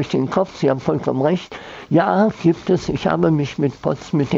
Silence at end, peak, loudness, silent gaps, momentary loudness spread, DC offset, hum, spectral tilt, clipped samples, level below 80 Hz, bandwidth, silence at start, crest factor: 0 s; -4 dBFS; -19 LUFS; none; 5 LU; under 0.1%; none; -7.5 dB/octave; under 0.1%; -48 dBFS; 7.6 kHz; 0 s; 16 dB